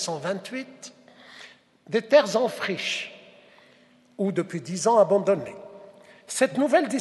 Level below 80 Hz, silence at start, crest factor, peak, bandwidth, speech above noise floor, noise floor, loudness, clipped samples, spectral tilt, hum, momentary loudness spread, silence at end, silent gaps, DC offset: -76 dBFS; 0 s; 20 dB; -6 dBFS; 12 kHz; 34 dB; -57 dBFS; -24 LUFS; under 0.1%; -4 dB/octave; none; 24 LU; 0 s; none; under 0.1%